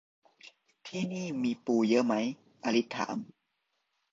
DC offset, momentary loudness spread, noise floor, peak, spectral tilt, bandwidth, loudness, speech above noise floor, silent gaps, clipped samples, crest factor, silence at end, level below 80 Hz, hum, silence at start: under 0.1%; 14 LU; -80 dBFS; -14 dBFS; -5.5 dB/octave; 7.6 kHz; -31 LUFS; 50 dB; none; under 0.1%; 18 dB; 0.9 s; -76 dBFS; none; 0.45 s